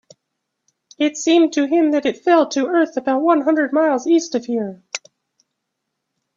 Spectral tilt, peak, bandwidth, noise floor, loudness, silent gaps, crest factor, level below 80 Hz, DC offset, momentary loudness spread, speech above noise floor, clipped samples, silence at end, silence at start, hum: -3.5 dB/octave; -2 dBFS; 7.8 kHz; -77 dBFS; -17 LUFS; none; 18 dB; -68 dBFS; under 0.1%; 9 LU; 61 dB; under 0.1%; 1.4 s; 1 s; none